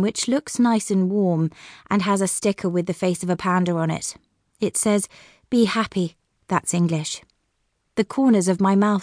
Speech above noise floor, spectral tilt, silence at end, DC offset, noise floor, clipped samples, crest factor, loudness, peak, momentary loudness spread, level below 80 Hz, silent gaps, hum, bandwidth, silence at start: 50 dB; -5 dB/octave; 0 s; under 0.1%; -71 dBFS; under 0.1%; 16 dB; -22 LUFS; -6 dBFS; 9 LU; -60 dBFS; none; none; 10.5 kHz; 0 s